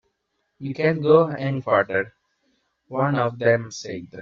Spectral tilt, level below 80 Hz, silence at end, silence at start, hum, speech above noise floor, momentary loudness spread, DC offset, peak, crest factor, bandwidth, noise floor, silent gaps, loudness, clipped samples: -5.5 dB/octave; -64 dBFS; 0 s; 0.6 s; none; 53 dB; 16 LU; under 0.1%; -4 dBFS; 20 dB; 7.6 kHz; -74 dBFS; none; -21 LUFS; under 0.1%